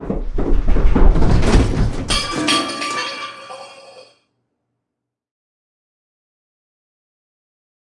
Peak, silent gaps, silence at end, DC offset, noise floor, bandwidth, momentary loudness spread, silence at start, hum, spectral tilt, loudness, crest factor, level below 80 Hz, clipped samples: 0 dBFS; none; 4.2 s; under 0.1%; -80 dBFS; 11.5 kHz; 16 LU; 0 s; none; -5 dB/octave; -18 LUFS; 16 dB; -20 dBFS; under 0.1%